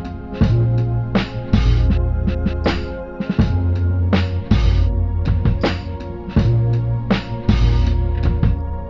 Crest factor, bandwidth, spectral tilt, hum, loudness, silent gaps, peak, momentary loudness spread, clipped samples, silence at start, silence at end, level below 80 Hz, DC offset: 16 dB; 6.4 kHz; -8.5 dB/octave; none; -19 LUFS; none; -2 dBFS; 5 LU; under 0.1%; 0 s; 0 s; -22 dBFS; under 0.1%